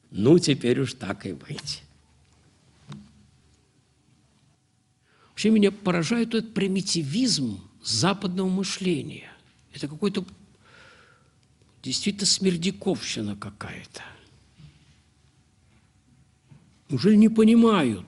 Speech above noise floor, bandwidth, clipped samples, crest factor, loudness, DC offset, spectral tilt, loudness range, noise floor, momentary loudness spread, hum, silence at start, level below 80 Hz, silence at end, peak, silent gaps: 43 dB; 11.5 kHz; under 0.1%; 20 dB; -24 LUFS; under 0.1%; -5 dB/octave; 15 LU; -66 dBFS; 22 LU; none; 0.1 s; -62 dBFS; 0.05 s; -6 dBFS; none